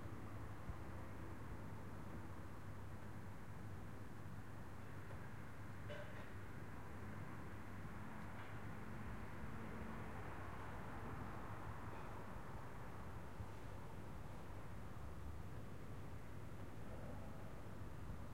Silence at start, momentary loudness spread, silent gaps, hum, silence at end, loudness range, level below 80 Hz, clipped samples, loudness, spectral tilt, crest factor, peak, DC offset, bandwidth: 0 s; 3 LU; none; none; 0 s; 3 LU; -62 dBFS; under 0.1%; -54 LUFS; -6.5 dB/octave; 16 dB; -36 dBFS; 0.3%; 16 kHz